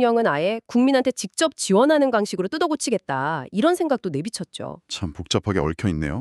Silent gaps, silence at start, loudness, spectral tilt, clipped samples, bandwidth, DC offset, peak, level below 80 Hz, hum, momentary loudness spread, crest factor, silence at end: none; 0 s; -22 LUFS; -5 dB/octave; under 0.1%; 13.5 kHz; under 0.1%; -6 dBFS; -46 dBFS; none; 12 LU; 16 dB; 0 s